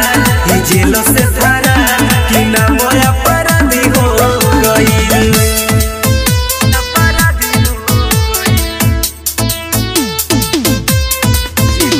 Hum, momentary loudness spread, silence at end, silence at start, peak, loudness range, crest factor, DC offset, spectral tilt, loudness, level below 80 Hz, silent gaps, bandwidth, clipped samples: none; 4 LU; 0 s; 0 s; 0 dBFS; 3 LU; 10 dB; under 0.1%; -4 dB/octave; -10 LUFS; -20 dBFS; none; 16.5 kHz; under 0.1%